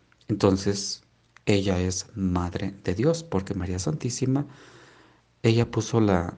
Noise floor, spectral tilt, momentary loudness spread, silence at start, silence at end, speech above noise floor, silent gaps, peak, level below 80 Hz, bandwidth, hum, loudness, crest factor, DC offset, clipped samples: -58 dBFS; -5.5 dB/octave; 8 LU; 0.3 s; 0 s; 33 dB; none; -4 dBFS; -56 dBFS; 10 kHz; none; -26 LUFS; 22 dB; under 0.1%; under 0.1%